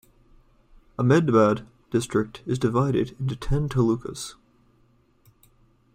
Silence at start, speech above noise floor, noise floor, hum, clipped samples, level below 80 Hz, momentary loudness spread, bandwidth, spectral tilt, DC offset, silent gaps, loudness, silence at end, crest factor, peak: 1 s; 39 dB; -61 dBFS; none; under 0.1%; -44 dBFS; 13 LU; 15 kHz; -7 dB/octave; under 0.1%; none; -24 LUFS; 1.65 s; 20 dB; -6 dBFS